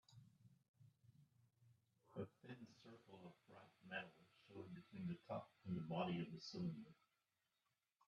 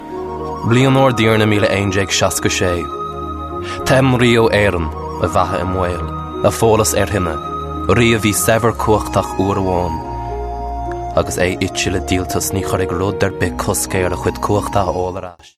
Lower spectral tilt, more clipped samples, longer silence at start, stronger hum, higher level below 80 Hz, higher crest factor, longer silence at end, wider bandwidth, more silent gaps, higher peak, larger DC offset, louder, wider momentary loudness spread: first, -7 dB/octave vs -5 dB/octave; neither; about the same, 0.1 s vs 0 s; neither; second, -88 dBFS vs -32 dBFS; first, 22 dB vs 14 dB; first, 1.15 s vs 0.1 s; second, 7.4 kHz vs 14 kHz; first, 0.68-0.74 s vs none; second, -32 dBFS vs -2 dBFS; neither; second, -52 LUFS vs -16 LUFS; first, 19 LU vs 12 LU